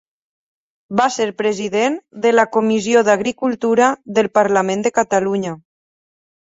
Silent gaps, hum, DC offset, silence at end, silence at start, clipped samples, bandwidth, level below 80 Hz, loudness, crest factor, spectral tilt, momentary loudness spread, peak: none; none; under 0.1%; 1 s; 0.9 s; under 0.1%; 8 kHz; -62 dBFS; -17 LUFS; 16 dB; -4.5 dB/octave; 6 LU; -2 dBFS